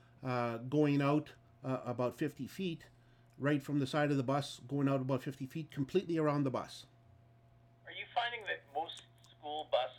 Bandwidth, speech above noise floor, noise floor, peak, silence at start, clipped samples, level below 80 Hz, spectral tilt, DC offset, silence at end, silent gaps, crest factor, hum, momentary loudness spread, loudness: 16 kHz; 29 dB; -64 dBFS; -20 dBFS; 0.2 s; under 0.1%; -74 dBFS; -6.5 dB/octave; under 0.1%; 0 s; none; 18 dB; none; 13 LU; -36 LUFS